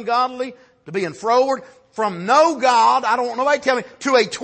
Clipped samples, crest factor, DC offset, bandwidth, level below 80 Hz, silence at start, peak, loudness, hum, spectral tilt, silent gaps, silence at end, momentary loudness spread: under 0.1%; 16 dB; under 0.1%; 8.8 kHz; -68 dBFS; 0 s; -4 dBFS; -18 LUFS; none; -3.5 dB/octave; none; 0 s; 12 LU